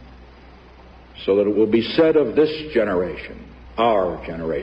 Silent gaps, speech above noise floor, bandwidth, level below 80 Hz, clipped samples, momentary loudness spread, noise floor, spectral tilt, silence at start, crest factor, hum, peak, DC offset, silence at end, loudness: none; 26 dB; 5.8 kHz; -44 dBFS; under 0.1%; 16 LU; -45 dBFS; -8 dB/octave; 0 s; 18 dB; none; -4 dBFS; under 0.1%; 0 s; -20 LUFS